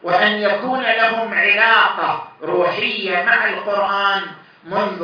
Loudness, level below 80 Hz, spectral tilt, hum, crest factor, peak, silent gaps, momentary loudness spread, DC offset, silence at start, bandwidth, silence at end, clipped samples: -16 LUFS; -72 dBFS; -5 dB/octave; none; 16 dB; 0 dBFS; none; 10 LU; under 0.1%; 0.05 s; 6.6 kHz; 0 s; under 0.1%